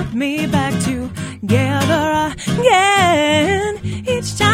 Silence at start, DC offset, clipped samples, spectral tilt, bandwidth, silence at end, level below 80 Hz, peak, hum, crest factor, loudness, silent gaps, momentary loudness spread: 0 s; under 0.1%; under 0.1%; -4.5 dB/octave; 16 kHz; 0 s; -40 dBFS; 0 dBFS; none; 16 dB; -16 LUFS; none; 10 LU